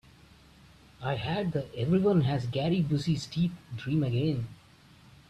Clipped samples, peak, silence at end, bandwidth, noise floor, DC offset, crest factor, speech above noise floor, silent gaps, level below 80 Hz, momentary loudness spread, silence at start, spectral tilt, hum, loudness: under 0.1%; -16 dBFS; 0.75 s; 11 kHz; -56 dBFS; under 0.1%; 14 dB; 28 dB; none; -56 dBFS; 10 LU; 1 s; -7.5 dB/octave; none; -29 LUFS